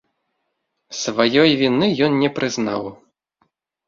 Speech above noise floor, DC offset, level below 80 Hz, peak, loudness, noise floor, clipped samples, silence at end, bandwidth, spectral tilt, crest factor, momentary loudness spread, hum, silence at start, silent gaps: 56 dB; under 0.1%; -60 dBFS; -2 dBFS; -18 LUFS; -74 dBFS; under 0.1%; 0.95 s; 7.6 kHz; -4.5 dB/octave; 18 dB; 13 LU; none; 0.9 s; none